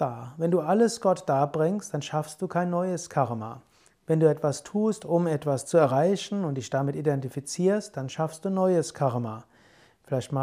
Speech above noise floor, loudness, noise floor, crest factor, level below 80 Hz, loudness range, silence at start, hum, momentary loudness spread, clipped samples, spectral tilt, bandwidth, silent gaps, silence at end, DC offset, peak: 33 dB; -27 LUFS; -58 dBFS; 18 dB; -70 dBFS; 3 LU; 0 s; none; 9 LU; under 0.1%; -6.5 dB/octave; 15.5 kHz; none; 0 s; under 0.1%; -8 dBFS